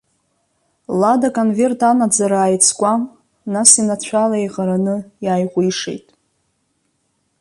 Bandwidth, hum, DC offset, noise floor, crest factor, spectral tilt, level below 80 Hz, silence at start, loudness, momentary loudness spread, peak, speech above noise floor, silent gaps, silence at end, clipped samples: 13 kHz; none; under 0.1%; -67 dBFS; 18 dB; -4 dB/octave; -62 dBFS; 0.9 s; -15 LUFS; 12 LU; 0 dBFS; 51 dB; none; 1.45 s; under 0.1%